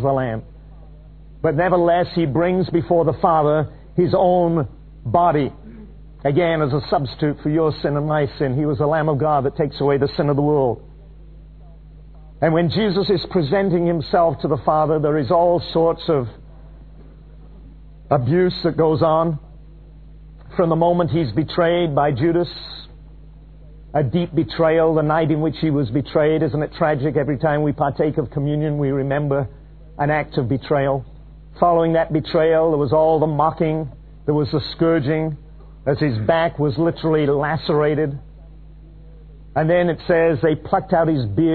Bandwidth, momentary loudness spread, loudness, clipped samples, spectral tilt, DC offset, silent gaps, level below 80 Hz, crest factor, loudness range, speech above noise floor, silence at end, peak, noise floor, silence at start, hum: 4.6 kHz; 7 LU; -19 LUFS; under 0.1%; -11 dB/octave; 0.2%; none; -42 dBFS; 18 dB; 3 LU; 23 dB; 0 s; -2 dBFS; -41 dBFS; 0 s; none